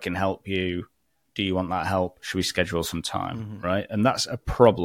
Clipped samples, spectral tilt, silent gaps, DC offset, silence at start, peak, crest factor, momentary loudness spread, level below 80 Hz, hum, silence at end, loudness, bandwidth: under 0.1%; -5 dB/octave; none; under 0.1%; 0 s; -2 dBFS; 22 dB; 7 LU; -46 dBFS; none; 0 s; -26 LUFS; 17 kHz